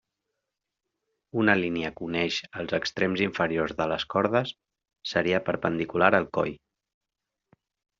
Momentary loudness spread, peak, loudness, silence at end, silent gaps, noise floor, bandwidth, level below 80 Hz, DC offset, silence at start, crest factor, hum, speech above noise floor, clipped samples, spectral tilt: 9 LU; -4 dBFS; -26 LUFS; 1.45 s; none; -86 dBFS; 7.4 kHz; -62 dBFS; under 0.1%; 1.35 s; 24 dB; none; 60 dB; under 0.1%; -3.5 dB/octave